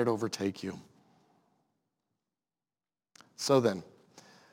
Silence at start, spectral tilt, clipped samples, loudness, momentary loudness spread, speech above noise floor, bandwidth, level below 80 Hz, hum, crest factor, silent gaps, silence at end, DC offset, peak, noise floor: 0 s; -5 dB/octave; under 0.1%; -31 LUFS; 15 LU; over 60 dB; 16.5 kHz; -82 dBFS; none; 22 dB; none; 0.3 s; under 0.1%; -12 dBFS; under -90 dBFS